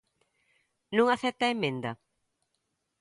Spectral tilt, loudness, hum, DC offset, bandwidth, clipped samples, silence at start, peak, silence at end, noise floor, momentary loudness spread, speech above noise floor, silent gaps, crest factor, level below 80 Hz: -5 dB/octave; -29 LUFS; none; under 0.1%; 11.5 kHz; under 0.1%; 0.9 s; -10 dBFS; 1.05 s; -80 dBFS; 13 LU; 52 dB; none; 22 dB; -74 dBFS